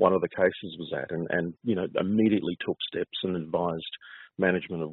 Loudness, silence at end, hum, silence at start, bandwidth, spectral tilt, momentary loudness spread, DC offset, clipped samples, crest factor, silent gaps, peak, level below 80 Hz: -28 LUFS; 0 s; none; 0 s; 4.2 kHz; -4.5 dB/octave; 11 LU; under 0.1%; under 0.1%; 20 dB; none; -8 dBFS; -66 dBFS